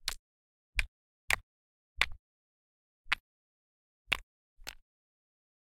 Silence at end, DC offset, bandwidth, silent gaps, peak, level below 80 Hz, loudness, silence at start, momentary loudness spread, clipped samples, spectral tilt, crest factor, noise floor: 0.9 s; under 0.1%; 16.5 kHz; 0.19-0.73 s, 0.88-1.28 s, 1.43-1.96 s, 2.19-3.05 s, 3.20-4.05 s, 4.23-4.57 s; -8 dBFS; -50 dBFS; -35 LUFS; 0.05 s; 15 LU; under 0.1%; -0.5 dB/octave; 34 dB; under -90 dBFS